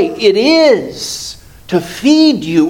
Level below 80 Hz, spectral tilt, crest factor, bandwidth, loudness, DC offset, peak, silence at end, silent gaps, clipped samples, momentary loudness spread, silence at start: -46 dBFS; -4.5 dB/octave; 12 dB; 16 kHz; -11 LUFS; under 0.1%; 0 dBFS; 0 s; none; under 0.1%; 12 LU; 0 s